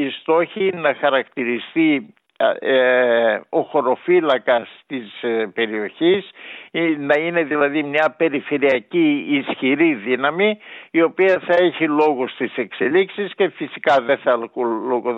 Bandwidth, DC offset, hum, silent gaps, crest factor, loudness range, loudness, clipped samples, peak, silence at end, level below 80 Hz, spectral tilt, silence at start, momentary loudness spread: 6.6 kHz; under 0.1%; none; none; 14 dB; 2 LU; -19 LUFS; under 0.1%; -4 dBFS; 0 s; -78 dBFS; -7 dB/octave; 0 s; 7 LU